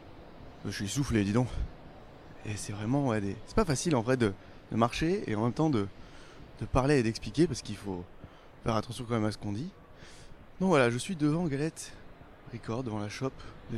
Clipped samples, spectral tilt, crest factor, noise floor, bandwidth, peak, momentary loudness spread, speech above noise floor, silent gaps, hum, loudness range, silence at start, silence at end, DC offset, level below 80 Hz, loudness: under 0.1%; -6 dB/octave; 22 dB; -50 dBFS; 14 kHz; -10 dBFS; 23 LU; 20 dB; none; none; 3 LU; 0 s; 0 s; under 0.1%; -48 dBFS; -31 LUFS